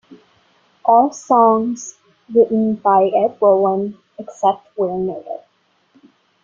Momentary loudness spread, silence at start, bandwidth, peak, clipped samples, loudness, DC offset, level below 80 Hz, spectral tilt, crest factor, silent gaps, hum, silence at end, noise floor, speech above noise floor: 17 LU; 0.1 s; 7.6 kHz; -2 dBFS; under 0.1%; -16 LUFS; under 0.1%; -62 dBFS; -6.5 dB/octave; 16 dB; none; none; 1.05 s; -61 dBFS; 45 dB